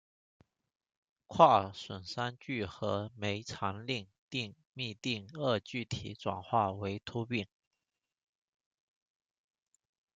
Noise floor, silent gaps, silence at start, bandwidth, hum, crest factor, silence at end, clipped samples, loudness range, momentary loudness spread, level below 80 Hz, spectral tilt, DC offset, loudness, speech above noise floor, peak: -89 dBFS; 4.19-4.28 s, 4.67-4.73 s; 1.3 s; 9.2 kHz; none; 28 dB; 2.7 s; under 0.1%; 7 LU; 14 LU; -70 dBFS; -5.5 dB/octave; under 0.1%; -34 LUFS; 56 dB; -8 dBFS